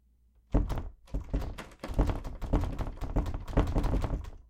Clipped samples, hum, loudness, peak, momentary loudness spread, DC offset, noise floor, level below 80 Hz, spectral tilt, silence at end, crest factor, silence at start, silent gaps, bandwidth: under 0.1%; none; -35 LUFS; -12 dBFS; 10 LU; under 0.1%; -64 dBFS; -34 dBFS; -7.5 dB/octave; 0.05 s; 20 dB; 0.5 s; none; 10.5 kHz